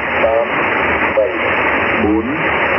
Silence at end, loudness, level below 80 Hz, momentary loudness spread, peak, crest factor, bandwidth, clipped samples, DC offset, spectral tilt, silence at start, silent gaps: 0 s; -14 LUFS; -40 dBFS; 2 LU; -2 dBFS; 14 dB; 5.8 kHz; under 0.1%; under 0.1%; -8 dB/octave; 0 s; none